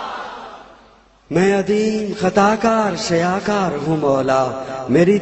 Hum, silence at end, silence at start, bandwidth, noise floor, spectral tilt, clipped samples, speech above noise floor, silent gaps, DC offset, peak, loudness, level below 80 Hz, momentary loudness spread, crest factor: none; 0 s; 0 s; 8.4 kHz; -49 dBFS; -6 dB/octave; under 0.1%; 33 dB; none; under 0.1%; -2 dBFS; -17 LUFS; -50 dBFS; 13 LU; 16 dB